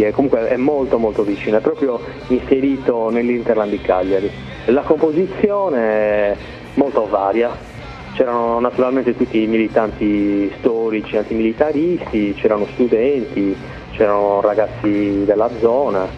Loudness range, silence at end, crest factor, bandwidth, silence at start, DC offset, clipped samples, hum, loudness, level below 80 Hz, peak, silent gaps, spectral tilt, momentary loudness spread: 1 LU; 0 s; 16 dB; 7.6 kHz; 0 s; under 0.1%; under 0.1%; none; -17 LUFS; -42 dBFS; 0 dBFS; none; -8 dB/octave; 5 LU